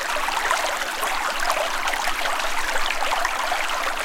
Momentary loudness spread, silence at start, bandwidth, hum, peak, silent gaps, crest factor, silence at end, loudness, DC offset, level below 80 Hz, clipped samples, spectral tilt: 2 LU; 0 s; 17 kHz; none; -2 dBFS; none; 20 dB; 0 s; -23 LUFS; under 0.1%; -36 dBFS; under 0.1%; 0 dB/octave